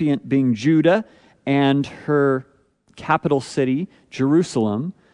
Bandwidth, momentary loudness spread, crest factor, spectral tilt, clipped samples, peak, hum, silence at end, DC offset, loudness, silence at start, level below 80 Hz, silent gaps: 10.5 kHz; 10 LU; 16 dB; -7 dB/octave; under 0.1%; -4 dBFS; none; 0.2 s; under 0.1%; -20 LUFS; 0 s; -60 dBFS; none